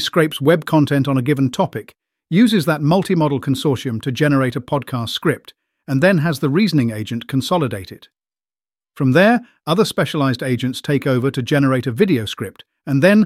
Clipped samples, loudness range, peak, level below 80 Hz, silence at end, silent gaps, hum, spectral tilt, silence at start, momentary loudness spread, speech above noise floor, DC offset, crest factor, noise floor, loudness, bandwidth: under 0.1%; 2 LU; -2 dBFS; -56 dBFS; 0 s; none; none; -6.5 dB/octave; 0 s; 8 LU; over 73 dB; under 0.1%; 16 dB; under -90 dBFS; -17 LUFS; 16 kHz